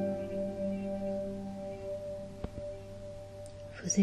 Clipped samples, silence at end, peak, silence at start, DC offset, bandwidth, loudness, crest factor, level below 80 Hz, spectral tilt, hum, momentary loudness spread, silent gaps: under 0.1%; 0 s; -16 dBFS; 0 s; under 0.1%; 12.5 kHz; -39 LUFS; 20 dB; -54 dBFS; -5 dB/octave; none; 11 LU; none